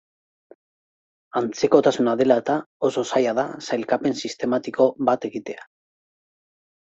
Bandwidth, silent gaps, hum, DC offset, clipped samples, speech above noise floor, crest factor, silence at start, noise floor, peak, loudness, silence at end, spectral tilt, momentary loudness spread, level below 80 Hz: 8.2 kHz; 2.66-2.80 s; none; under 0.1%; under 0.1%; over 69 dB; 22 dB; 1.35 s; under -90 dBFS; -2 dBFS; -22 LUFS; 1.35 s; -5 dB/octave; 10 LU; -66 dBFS